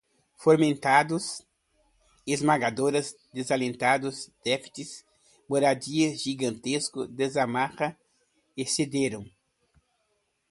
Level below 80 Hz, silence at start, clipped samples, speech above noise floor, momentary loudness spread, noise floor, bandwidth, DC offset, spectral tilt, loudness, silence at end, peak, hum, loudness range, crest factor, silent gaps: -68 dBFS; 0.4 s; under 0.1%; 48 dB; 14 LU; -74 dBFS; 11.5 kHz; under 0.1%; -4 dB/octave; -27 LUFS; 1.25 s; -6 dBFS; none; 4 LU; 22 dB; none